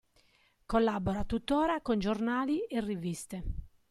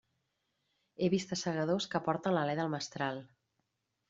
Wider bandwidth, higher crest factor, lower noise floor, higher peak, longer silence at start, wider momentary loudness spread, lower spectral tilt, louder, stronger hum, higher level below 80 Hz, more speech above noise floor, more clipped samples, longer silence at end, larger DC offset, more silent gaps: first, 13 kHz vs 7.8 kHz; about the same, 16 dB vs 20 dB; second, -68 dBFS vs -82 dBFS; about the same, -16 dBFS vs -16 dBFS; second, 0.7 s vs 1 s; first, 11 LU vs 5 LU; about the same, -6 dB/octave vs -5 dB/octave; about the same, -32 LUFS vs -34 LUFS; neither; first, -46 dBFS vs -74 dBFS; second, 37 dB vs 49 dB; neither; second, 0.2 s vs 0.85 s; neither; neither